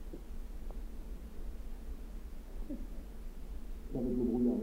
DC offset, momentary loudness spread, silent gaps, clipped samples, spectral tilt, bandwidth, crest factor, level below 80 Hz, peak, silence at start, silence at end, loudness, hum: under 0.1%; 16 LU; none; under 0.1%; -8.5 dB/octave; 16 kHz; 16 dB; -42 dBFS; -22 dBFS; 0 s; 0 s; -42 LUFS; none